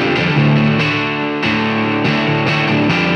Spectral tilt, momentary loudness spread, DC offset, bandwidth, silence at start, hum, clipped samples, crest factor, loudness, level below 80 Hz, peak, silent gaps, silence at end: -6.5 dB/octave; 4 LU; under 0.1%; 8.4 kHz; 0 s; none; under 0.1%; 12 dB; -14 LUFS; -44 dBFS; -2 dBFS; none; 0 s